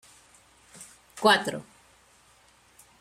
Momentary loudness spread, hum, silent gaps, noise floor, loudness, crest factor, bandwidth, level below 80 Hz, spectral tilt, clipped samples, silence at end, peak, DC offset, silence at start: 26 LU; none; none; -60 dBFS; -24 LUFS; 24 dB; 16 kHz; -70 dBFS; -3 dB/octave; under 0.1%; 1.4 s; -6 dBFS; under 0.1%; 0.8 s